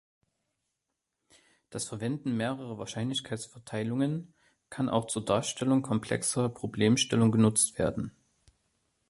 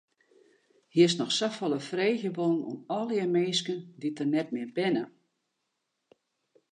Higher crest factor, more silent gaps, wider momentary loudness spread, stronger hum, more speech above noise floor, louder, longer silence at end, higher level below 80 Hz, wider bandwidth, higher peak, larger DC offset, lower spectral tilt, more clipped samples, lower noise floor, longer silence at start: about the same, 20 dB vs 20 dB; neither; first, 14 LU vs 10 LU; neither; about the same, 55 dB vs 53 dB; about the same, -30 LUFS vs -29 LUFS; second, 1 s vs 1.65 s; first, -60 dBFS vs -84 dBFS; first, 12 kHz vs 10 kHz; about the same, -10 dBFS vs -10 dBFS; neither; about the same, -4.5 dB/octave vs -5 dB/octave; neither; first, -85 dBFS vs -81 dBFS; first, 1.7 s vs 0.95 s